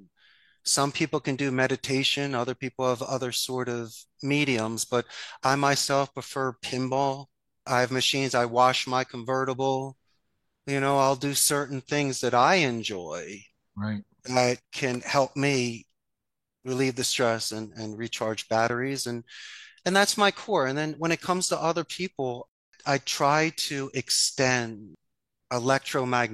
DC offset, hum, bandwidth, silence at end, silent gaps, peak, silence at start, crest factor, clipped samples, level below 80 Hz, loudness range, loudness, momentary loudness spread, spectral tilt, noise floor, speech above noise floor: under 0.1%; none; 13.5 kHz; 0 s; 22.48-22.72 s; -6 dBFS; 0.65 s; 22 dB; under 0.1%; -68 dBFS; 3 LU; -26 LUFS; 13 LU; -3.5 dB/octave; -86 dBFS; 60 dB